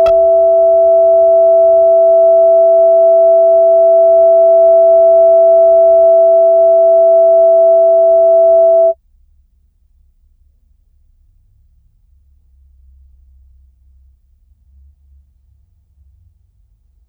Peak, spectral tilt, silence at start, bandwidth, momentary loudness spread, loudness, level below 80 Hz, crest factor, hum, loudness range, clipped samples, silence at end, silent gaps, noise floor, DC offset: -2 dBFS; -8.5 dB/octave; 0 s; 3.4 kHz; 1 LU; -8 LUFS; -48 dBFS; 8 dB; none; 6 LU; under 0.1%; 8.15 s; none; -53 dBFS; under 0.1%